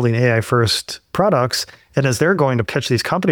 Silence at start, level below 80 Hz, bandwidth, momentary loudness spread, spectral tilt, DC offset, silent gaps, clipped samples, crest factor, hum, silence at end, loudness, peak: 0 s; -50 dBFS; 19 kHz; 5 LU; -5 dB/octave; under 0.1%; none; under 0.1%; 14 dB; none; 0 s; -18 LUFS; -2 dBFS